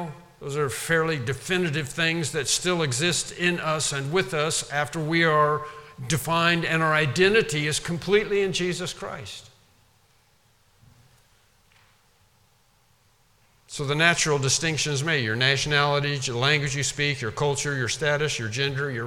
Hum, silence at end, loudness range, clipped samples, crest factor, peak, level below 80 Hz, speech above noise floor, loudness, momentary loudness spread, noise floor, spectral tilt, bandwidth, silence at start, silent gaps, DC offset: none; 0 s; 7 LU; under 0.1%; 22 dB; -4 dBFS; -54 dBFS; 38 dB; -23 LUFS; 9 LU; -63 dBFS; -3.5 dB/octave; 17 kHz; 0 s; none; under 0.1%